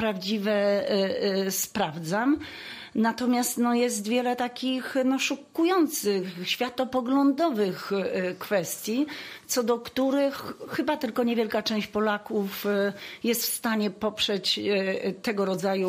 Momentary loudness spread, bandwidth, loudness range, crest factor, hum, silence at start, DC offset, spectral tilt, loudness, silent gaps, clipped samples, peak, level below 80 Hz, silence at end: 5 LU; 15.5 kHz; 2 LU; 14 dB; none; 0 s; under 0.1%; -4 dB/octave; -27 LUFS; none; under 0.1%; -12 dBFS; -66 dBFS; 0 s